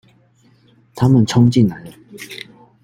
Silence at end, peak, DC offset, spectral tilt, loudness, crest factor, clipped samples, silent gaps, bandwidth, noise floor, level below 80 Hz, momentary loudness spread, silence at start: 0.45 s; -2 dBFS; under 0.1%; -7 dB/octave; -14 LUFS; 16 dB; under 0.1%; none; 15 kHz; -53 dBFS; -50 dBFS; 24 LU; 0.95 s